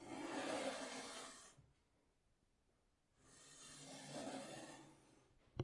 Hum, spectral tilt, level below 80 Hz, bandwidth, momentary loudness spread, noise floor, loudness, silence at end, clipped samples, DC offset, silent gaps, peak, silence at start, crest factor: none; -3.5 dB/octave; -78 dBFS; 11.5 kHz; 18 LU; -81 dBFS; -50 LUFS; 0 s; under 0.1%; under 0.1%; none; -30 dBFS; 0 s; 22 dB